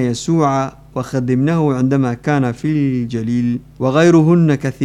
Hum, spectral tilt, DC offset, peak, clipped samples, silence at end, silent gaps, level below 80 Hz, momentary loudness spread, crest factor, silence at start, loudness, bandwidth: none; -7.5 dB/octave; under 0.1%; -2 dBFS; under 0.1%; 0 s; none; -46 dBFS; 9 LU; 12 dB; 0 s; -16 LUFS; 10.5 kHz